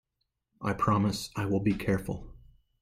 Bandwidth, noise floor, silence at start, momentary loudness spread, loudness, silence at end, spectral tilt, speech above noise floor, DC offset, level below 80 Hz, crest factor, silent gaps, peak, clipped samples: 15.5 kHz; -82 dBFS; 0.6 s; 11 LU; -30 LUFS; 0.45 s; -6.5 dB/octave; 53 dB; under 0.1%; -52 dBFS; 16 dB; none; -14 dBFS; under 0.1%